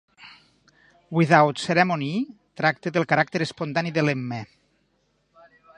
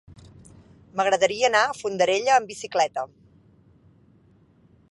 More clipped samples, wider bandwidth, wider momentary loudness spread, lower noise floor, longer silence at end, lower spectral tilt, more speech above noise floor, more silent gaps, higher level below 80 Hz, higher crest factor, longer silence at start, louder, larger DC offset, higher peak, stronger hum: neither; second, 10 kHz vs 11.5 kHz; about the same, 11 LU vs 12 LU; first, -69 dBFS vs -57 dBFS; second, 1.3 s vs 1.85 s; first, -6 dB/octave vs -2.5 dB/octave; first, 46 dB vs 35 dB; neither; about the same, -66 dBFS vs -62 dBFS; about the same, 24 dB vs 20 dB; second, 0.2 s vs 0.95 s; about the same, -23 LUFS vs -23 LUFS; neither; about the same, -2 dBFS vs -4 dBFS; neither